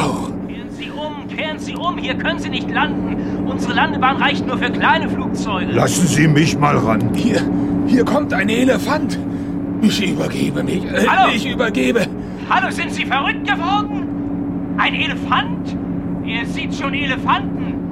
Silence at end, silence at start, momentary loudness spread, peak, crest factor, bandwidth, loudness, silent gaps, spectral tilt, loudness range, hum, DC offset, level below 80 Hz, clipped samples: 0 s; 0 s; 9 LU; -2 dBFS; 16 dB; 15 kHz; -18 LUFS; none; -5 dB/octave; 4 LU; none; 0.3%; -40 dBFS; under 0.1%